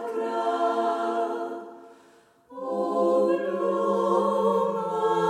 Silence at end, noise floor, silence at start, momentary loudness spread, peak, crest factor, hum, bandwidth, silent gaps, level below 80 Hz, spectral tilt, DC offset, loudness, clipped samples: 0 s; -57 dBFS; 0 s; 12 LU; -12 dBFS; 14 dB; none; 14 kHz; none; -86 dBFS; -6.5 dB/octave; under 0.1%; -25 LUFS; under 0.1%